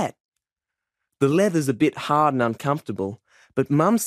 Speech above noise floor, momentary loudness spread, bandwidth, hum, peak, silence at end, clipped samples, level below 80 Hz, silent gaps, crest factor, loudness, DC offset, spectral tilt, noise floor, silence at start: 66 dB; 11 LU; 15.5 kHz; none; -4 dBFS; 0 s; under 0.1%; -64 dBFS; 0.20-0.32 s; 18 dB; -22 LUFS; under 0.1%; -6 dB/octave; -87 dBFS; 0 s